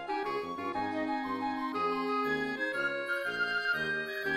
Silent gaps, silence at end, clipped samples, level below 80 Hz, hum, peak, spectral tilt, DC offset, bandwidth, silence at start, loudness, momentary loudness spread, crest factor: none; 0 s; under 0.1%; -66 dBFS; none; -20 dBFS; -4.5 dB/octave; under 0.1%; 16 kHz; 0 s; -33 LUFS; 4 LU; 12 dB